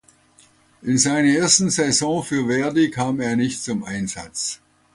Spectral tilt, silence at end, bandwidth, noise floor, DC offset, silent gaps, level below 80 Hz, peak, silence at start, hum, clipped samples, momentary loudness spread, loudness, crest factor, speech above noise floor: -3.5 dB/octave; 0.4 s; 11.5 kHz; -55 dBFS; under 0.1%; none; -56 dBFS; -2 dBFS; 0.85 s; none; under 0.1%; 12 LU; -20 LUFS; 18 dB; 35 dB